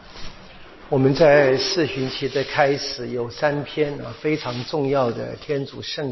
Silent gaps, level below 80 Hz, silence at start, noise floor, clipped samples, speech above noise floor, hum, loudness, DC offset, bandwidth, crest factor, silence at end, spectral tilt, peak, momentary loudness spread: none; -50 dBFS; 0 s; -42 dBFS; under 0.1%; 21 dB; none; -21 LUFS; under 0.1%; 6.2 kHz; 20 dB; 0 s; -5.5 dB/octave; -2 dBFS; 13 LU